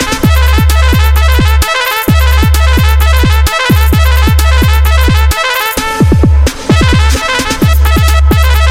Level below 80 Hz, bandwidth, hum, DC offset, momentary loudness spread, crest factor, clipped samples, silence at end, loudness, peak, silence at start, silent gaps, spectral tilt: -8 dBFS; 16.5 kHz; none; under 0.1%; 2 LU; 6 dB; under 0.1%; 0 s; -8 LUFS; 0 dBFS; 0 s; none; -5 dB/octave